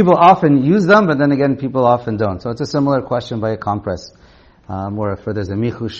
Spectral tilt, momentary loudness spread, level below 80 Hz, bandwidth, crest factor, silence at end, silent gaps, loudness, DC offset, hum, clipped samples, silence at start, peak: -7.5 dB/octave; 13 LU; -48 dBFS; 7.6 kHz; 16 dB; 0 s; none; -15 LUFS; under 0.1%; none; under 0.1%; 0 s; 0 dBFS